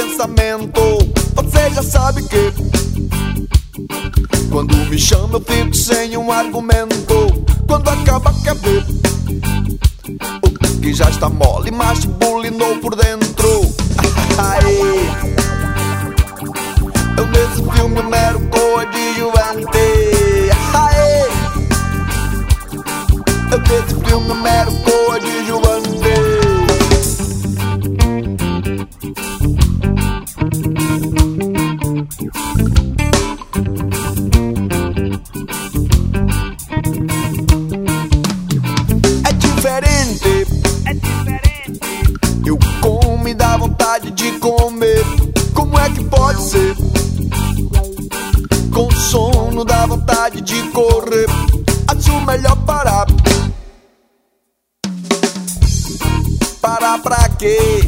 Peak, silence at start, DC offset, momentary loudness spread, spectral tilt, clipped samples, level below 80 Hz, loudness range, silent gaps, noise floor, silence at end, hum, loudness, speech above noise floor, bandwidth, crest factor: 0 dBFS; 0 s; 0.3%; 6 LU; -5 dB/octave; 0.1%; -18 dBFS; 3 LU; none; -67 dBFS; 0 s; none; -15 LUFS; 55 dB; 16.5 kHz; 14 dB